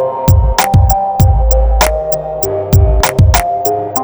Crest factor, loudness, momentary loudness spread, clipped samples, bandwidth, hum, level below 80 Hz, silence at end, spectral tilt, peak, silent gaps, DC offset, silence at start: 10 dB; -11 LUFS; 6 LU; under 0.1%; over 20 kHz; none; -14 dBFS; 0 s; -5.5 dB/octave; 0 dBFS; none; under 0.1%; 0 s